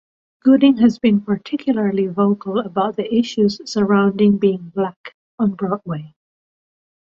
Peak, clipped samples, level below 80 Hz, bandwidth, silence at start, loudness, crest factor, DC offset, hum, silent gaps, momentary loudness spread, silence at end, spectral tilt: -2 dBFS; under 0.1%; -60 dBFS; 7.4 kHz; 0.45 s; -18 LUFS; 16 dB; under 0.1%; none; 4.96-5.04 s, 5.14-5.38 s; 10 LU; 0.95 s; -7.5 dB/octave